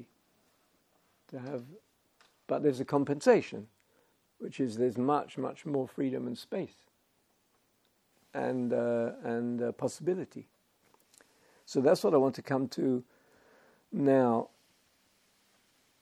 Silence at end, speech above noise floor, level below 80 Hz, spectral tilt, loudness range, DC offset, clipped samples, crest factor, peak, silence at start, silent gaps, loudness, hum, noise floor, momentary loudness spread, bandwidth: 1.55 s; 42 dB; -82 dBFS; -6.5 dB/octave; 6 LU; under 0.1%; under 0.1%; 22 dB; -12 dBFS; 0 s; none; -31 LUFS; none; -73 dBFS; 17 LU; 15 kHz